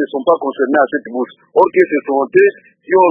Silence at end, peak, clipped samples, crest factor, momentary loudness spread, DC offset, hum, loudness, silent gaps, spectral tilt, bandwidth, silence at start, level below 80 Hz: 0 s; 0 dBFS; under 0.1%; 14 dB; 7 LU; under 0.1%; none; -14 LUFS; none; -8 dB/octave; 3.8 kHz; 0 s; -62 dBFS